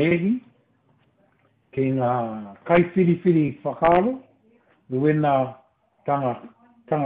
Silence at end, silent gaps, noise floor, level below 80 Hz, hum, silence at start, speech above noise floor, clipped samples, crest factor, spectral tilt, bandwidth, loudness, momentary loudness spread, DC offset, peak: 0 s; none; -63 dBFS; -56 dBFS; none; 0 s; 42 dB; under 0.1%; 18 dB; -7 dB/octave; 4 kHz; -22 LUFS; 13 LU; under 0.1%; -6 dBFS